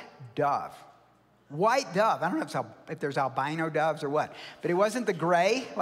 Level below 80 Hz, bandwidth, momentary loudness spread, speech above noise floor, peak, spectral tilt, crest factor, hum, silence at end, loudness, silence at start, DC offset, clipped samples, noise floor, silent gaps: -76 dBFS; 16 kHz; 11 LU; 34 dB; -12 dBFS; -5 dB/octave; 18 dB; none; 0 s; -28 LUFS; 0 s; under 0.1%; under 0.1%; -62 dBFS; none